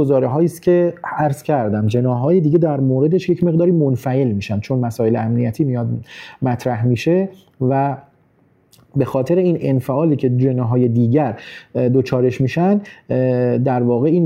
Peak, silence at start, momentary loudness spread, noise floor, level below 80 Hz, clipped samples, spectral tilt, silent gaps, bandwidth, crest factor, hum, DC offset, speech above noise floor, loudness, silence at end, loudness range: -4 dBFS; 0 s; 7 LU; -56 dBFS; -54 dBFS; under 0.1%; -9 dB/octave; none; 14.5 kHz; 14 dB; none; under 0.1%; 40 dB; -17 LUFS; 0 s; 3 LU